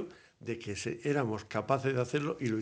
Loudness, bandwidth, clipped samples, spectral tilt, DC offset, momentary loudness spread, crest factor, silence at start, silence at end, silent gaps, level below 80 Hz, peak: -34 LUFS; 9.8 kHz; under 0.1%; -6 dB/octave; under 0.1%; 10 LU; 20 dB; 0 s; 0 s; none; -68 dBFS; -14 dBFS